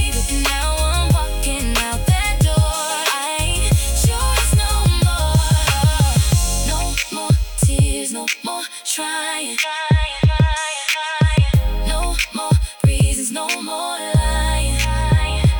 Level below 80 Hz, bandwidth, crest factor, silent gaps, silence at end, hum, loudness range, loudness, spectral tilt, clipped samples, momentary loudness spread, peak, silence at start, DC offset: -22 dBFS; 18 kHz; 14 dB; none; 0 s; none; 3 LU; -18 LUFS; -4 dB/octave; under 0.1%; 5 LU; -2 dBFS; 0 s; under 0.1%